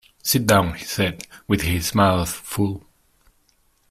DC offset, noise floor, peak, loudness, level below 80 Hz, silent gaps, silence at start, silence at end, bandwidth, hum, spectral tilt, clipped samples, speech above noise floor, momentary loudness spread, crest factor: under 0.1%; -62 dBFS; -2 dBFS; -21 LUFS; -44 dBFS; none; 0.25 s; 1.1 s; 16 kHz; none; -4.5 dB/octave; under 0.1%; 42 dB; 9 LU; 20 dB